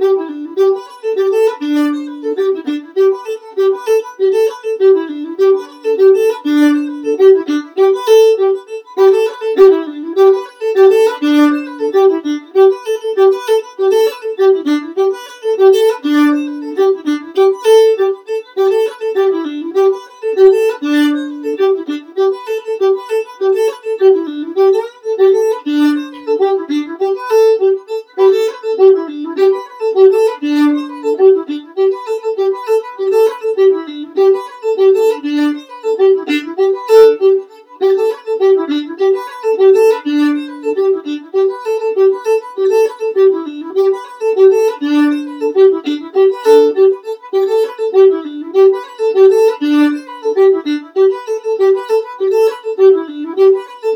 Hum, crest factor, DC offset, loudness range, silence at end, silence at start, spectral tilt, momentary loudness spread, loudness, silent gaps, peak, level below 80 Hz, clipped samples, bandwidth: none; 12 dB; under 0.1%; 3 LU; 0 s; 0 s; -3.5 dB/octave; 10 LU; -13 LUFS; none; 0 dBFS; -68 dBFS; 0.1%; 16.5 kHz